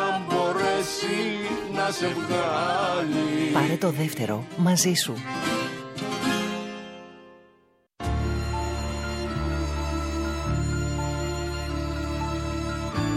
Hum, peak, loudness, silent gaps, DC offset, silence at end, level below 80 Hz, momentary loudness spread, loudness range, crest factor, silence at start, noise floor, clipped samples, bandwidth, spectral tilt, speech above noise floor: none; -8 dBFS; -27 LUFS; none; under 0.1%; 0 s; -36 dBFS; 7 LU; 6 LU; 18 dB; 0 s; -62 dBFS; under 0.1%; 16 kHz; -4.5 dB/octave; 38 dB